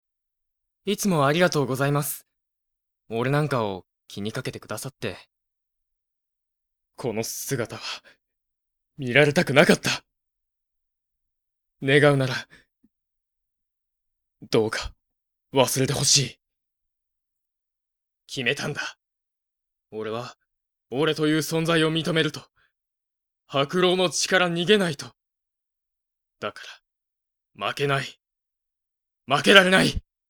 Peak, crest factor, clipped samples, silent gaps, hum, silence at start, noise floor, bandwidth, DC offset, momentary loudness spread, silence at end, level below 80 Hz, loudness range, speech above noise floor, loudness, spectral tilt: 0 dBFS; 26 dB; under 0.1%; none; none; 0.85 s; -85 dBFS; 20 kHz; under 0.1%; 17 LU; 0.3 s; -54 dBFS; 10 LU; 62 dB; -22 LUFS; -4 dB/octave